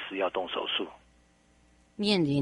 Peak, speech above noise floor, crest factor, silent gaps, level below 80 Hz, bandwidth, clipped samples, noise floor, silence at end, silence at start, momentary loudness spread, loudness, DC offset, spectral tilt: -12 dBFS; 34 dB; 20 dB; none; -64 dBFS; 11.5 kHz; under 0.1%; -63 dBFS; 0 s; 0 s; 12 LU; -30 LUFS; under 0.1%; -6 dB/octave